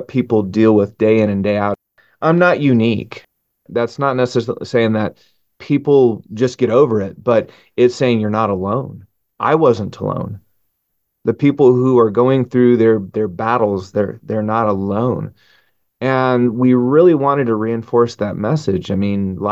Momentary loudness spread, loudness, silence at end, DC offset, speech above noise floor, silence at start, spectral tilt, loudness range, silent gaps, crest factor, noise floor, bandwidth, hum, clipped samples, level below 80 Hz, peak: 10 LU; -16 LUFS; 0 s; under 0.1%; 55 dB; 0 s; -8 dB/octave; 4 LU; none; 16 dB; -70 dBFS; 7.8 kHz; none; under 0.1%; -48 dBFS; 0 dBFS